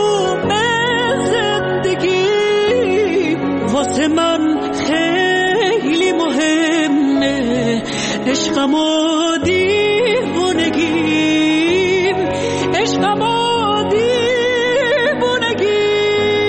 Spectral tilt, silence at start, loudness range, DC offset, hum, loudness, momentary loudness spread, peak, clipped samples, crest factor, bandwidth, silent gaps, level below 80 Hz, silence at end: -4 dB/octave; 0 s; 1 LU; under 0.1%; none; -15 LUFS; 3 LU; -4 dBFS; under 0.1%; 10 dB; 8.8 kHz; none; -48 dBFS; 0 s